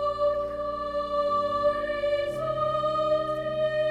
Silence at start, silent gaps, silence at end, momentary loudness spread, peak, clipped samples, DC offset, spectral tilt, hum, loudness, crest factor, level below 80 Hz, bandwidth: 0 s; none; 0 s; 4 LU; -14 dBFS; under 0.1%; under 0.1%; -6 dB/octave; none; -27 LUFS; 12 dB; -52 dBFS; 9.6 kHz